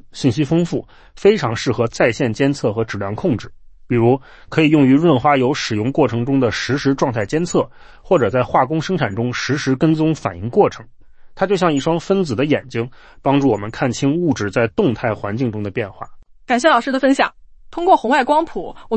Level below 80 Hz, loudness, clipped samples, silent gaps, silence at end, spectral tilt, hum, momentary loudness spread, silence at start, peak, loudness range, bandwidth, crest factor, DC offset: -46 dBFS; -17 LUFS; under 0.1%; none; 0 s; -6 dB/octave; none; 9 LU; 0.15 s; -2 dBFS; 3 LU; 8.8 kHz; 16 dB; under 0.1%